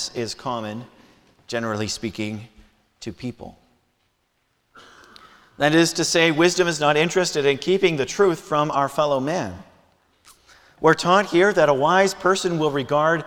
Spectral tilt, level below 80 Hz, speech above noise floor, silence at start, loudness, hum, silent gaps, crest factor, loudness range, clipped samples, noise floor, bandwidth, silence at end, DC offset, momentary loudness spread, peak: -4 dB/octave; -58 dBFS; 49 dB; 0 s; -20 LUFS; none; none; 20 dB; 13 LU; under 0.1%; -69 dBFS; 17.5 kHz; 0 s; under 0.1%; 16 LU; -2 dBFS